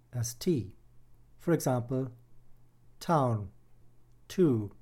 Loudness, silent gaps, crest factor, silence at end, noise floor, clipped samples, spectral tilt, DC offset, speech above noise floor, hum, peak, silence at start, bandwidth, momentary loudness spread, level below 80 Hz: -31 LUFS; none; 18 dB; 0.1 s; -56 dBFS; under 0.1%; -6.5 dB/octave; under 0.1%; 26 dB; none; -14 dBFS; 0.15 s; 16.5 kHz; 14 LU; -60 dBFS